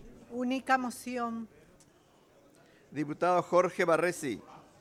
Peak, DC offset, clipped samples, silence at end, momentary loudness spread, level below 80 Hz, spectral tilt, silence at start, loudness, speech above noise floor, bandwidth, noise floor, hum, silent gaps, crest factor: -14 dBFS; under 0.1%; under 0.1%; 0.2 s; 16 LU; -68 dBFS; -5 dB/octave; 0 s; -31 LUFS; 33 dB; 15.5 kHz; -63 dBFS; none; none; 20 dB